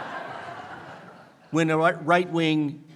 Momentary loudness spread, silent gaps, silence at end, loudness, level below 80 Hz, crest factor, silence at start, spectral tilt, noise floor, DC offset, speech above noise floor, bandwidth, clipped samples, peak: 20 LU; none; 0 s; -24 LUFS; -74 dBFS; 20 dB; 0 s; -6 dB/octave; -49 dBFS; under 0.1%; 26 dB; 11.5 kHz; under 0.1%; -6 dBFS